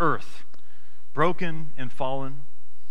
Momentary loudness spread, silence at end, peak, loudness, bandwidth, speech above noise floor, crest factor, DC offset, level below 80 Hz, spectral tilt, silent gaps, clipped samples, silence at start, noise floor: 22 LU; 0 s; -8 dBFS; -30 LUFS; 16.5 kHz; 33 dB; 22 dB; 10%; -58 dBFS; -7 dB/octave; none; under 0.1%; 0 s; -61 dBFS